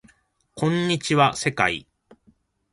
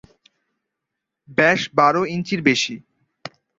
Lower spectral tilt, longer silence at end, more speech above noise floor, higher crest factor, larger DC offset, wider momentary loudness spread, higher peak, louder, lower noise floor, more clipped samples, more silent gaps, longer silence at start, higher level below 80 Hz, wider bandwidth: about the same, -4.5 dB/octave vs -4.5 dB/octave; first, 0.9 s vs 0.3 s; second, 41 dB vs 63 dB; about the same, 22 dB vs 20 dB; neither; second, 7 LU vs 22 LU; about the same, -2 dBFS vs -2 dBFS; second, -22 LUFS vs -18 LUFS; second, -62 dBFS vs -82 dBFS; neither; neither; second, 0.55 s vs 1.3 s; about the same, -58 dBFS vs -62 dBFS; first, 11.5 kHz vs 7.8 kHz